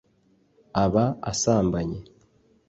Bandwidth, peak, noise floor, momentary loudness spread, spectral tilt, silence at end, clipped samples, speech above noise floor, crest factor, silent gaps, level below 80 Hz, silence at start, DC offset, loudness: 8.2 kHz; -8 dBFS; -64 dBFS; 10 LU; -5.5 dB/octave; 0.65 s; under 0.1%; 40 dB; 18 dB; none; -46 dBFS; 0.75 s; under 0.1%; -24 LUFS